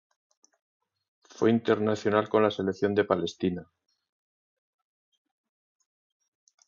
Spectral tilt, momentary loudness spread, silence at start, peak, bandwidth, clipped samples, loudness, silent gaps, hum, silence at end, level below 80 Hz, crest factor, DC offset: -6.5 dB/octave; 7 LU; 1.4 s; -8 dBFS; 7.4 kHz; under 0.1%; -27 LUFS; none; none; 3.05 s; -62 dBFS; 22 dB; under 0.1%